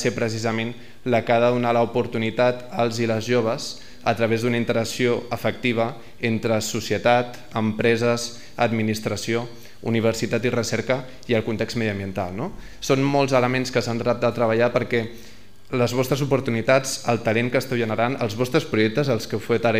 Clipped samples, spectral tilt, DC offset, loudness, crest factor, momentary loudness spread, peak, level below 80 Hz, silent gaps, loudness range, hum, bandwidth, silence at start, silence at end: under 0.1%; -5.5 dB/octave; 1%; -23 LUFS; 18 dB; 8 LU; -4 dBFS; -52 dBFS; none; 2 LU; none; 16 kHz; 0 s; 0 s